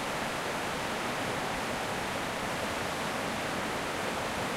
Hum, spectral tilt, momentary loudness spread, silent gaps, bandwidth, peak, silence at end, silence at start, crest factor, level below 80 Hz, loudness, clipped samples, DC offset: none; -3.5 dB/octave; 0 LU; none; 16 kHz; -20 dBFS; 0 s; 0 s; 14 dB; -54 dBFS; -33 LUFS; under 0.1%; under 0.1%